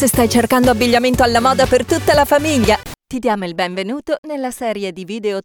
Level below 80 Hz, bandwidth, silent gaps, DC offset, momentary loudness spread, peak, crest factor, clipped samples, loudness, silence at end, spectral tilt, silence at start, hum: -36 dBFS; over 20 kHz; 4.18-4.23 s; under 0.1%; 10 LU; -4 dBFS; 12 dB; under 0.1%; -15 LUFS; 0.05 s; -4.5 dB/octave; 0 s; none